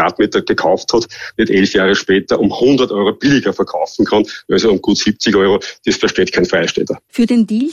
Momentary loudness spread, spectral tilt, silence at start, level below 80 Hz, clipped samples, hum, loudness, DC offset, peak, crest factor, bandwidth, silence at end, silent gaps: 5 LU; -4.5 dB/octave; 0 s; -48 dBFS; under 0.1%; none; -14 LUFS; under 0.1%; -2 dBFS; 12 dB; 10.5 kHz; 0 s; none